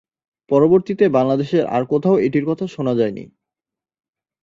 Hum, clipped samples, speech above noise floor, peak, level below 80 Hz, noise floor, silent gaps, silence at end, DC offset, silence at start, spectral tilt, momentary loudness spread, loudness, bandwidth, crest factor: none; under 0.1%; 71 dB; -2 dBFS; -58 dBFS; -88 dBFS; none; 1.15 s; under 0.1%; 0.5 s; -8.5 dB/octave; 8 LU; -17 LUFS; 7.4 kHz; 16 dB